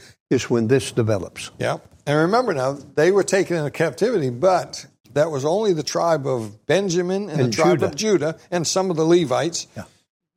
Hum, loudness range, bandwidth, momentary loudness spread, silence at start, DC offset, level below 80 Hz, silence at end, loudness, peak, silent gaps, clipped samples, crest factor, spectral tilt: none; 1 LU; 15 kHz; 9 LU; 0.3 s; under 0.1%; -60 dBFS; 0.55 s; -21 LUFS; -6 dBFS; 5.00-5.04 s; under 0.1%; 16 dB; -5 dB/octave